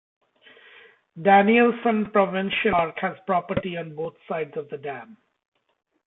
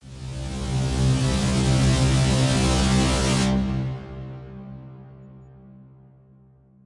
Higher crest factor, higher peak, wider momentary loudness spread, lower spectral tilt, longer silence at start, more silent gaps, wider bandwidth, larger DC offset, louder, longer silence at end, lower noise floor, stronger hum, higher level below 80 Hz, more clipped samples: about the same, 18 dB vs 16 dB; about the same, -6 dBFS vs -8 dBFS; second, 16 LU vs 19 LU; first, -10 dB/octave vs -5.5 dB/octave; first, 1.15 s vs 0.05 s; neither; second, 4 kHz vs 11.5 kHz; neither; about the same, -22 LUFS vs -22 LUFS; second, 0.95 s vs 1.15 s; about the same, -53 dBFS vs -54 dBFS; neither; second, -58 dBFS vs -32 dBFS; neither